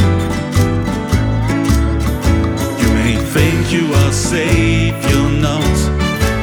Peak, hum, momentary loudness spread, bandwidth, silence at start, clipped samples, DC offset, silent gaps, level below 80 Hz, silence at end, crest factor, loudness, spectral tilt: 0 dBFS; none; 3 LU; over 20 kHz; 0 s; under 0.1%; under 0.1%; none; -22 dBFS; 0 s; 12 dB; -14 LUFS; -5.5 dB/octave